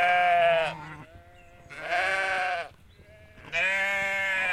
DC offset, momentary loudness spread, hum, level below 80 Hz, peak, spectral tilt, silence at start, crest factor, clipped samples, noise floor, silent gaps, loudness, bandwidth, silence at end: under 0.1%; 20 LU; none; -60 dBFS; -12 dBFS; -2.5 dB/octave; 0 s; 16 dB; under 0.1%; -53 dBFS; none; -25 LUFS; 13 kHz; 0 s